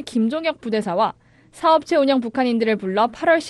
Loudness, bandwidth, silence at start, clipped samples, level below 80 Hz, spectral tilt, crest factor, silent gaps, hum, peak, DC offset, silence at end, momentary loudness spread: -20 LUFS; 12 kHz; 0 s; under 0.1%; -60 dBFS; -5.5 dB/octave; 16 dB; none; none; -4 dBFS; under 0.1%; 0 s; 6 LU